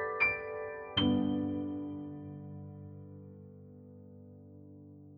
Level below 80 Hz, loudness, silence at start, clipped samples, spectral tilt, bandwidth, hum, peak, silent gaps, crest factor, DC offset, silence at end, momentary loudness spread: -62 dBFS; -34 LUFS; 0 s; under 0.1%; -8 dB/octave; 5.2 kHz; none; -16 dBFS; none; 20 dB; under 0.1%; 0 s; 24 LU